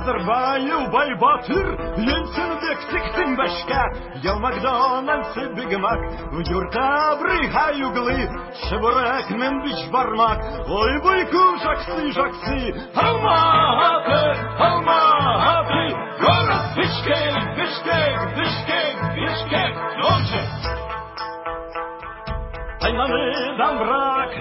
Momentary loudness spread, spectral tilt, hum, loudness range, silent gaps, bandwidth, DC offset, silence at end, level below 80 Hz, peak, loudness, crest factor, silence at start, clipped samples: 11 LU; -9.5 dB/octave; none; 6 LU; none; 5.8 kHz; under 0.1%; 0 s; -36 dBFS; -2 dBFS; -20 LUFS; 18 dB; 0 s; under 0.1%